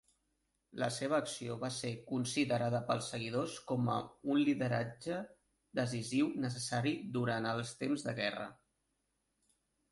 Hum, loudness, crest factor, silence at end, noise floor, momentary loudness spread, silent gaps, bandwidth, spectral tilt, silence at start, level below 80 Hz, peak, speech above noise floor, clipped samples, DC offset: none; -37 LUFS; 18 dB; 1.35 s; -83 dBFS; 8 LU; none; 11.5 kHz; -5 dB/octave; 0.75 s; -72 dBFS; -20 dBFS; 46 dB; under 0.1%; under 0.1%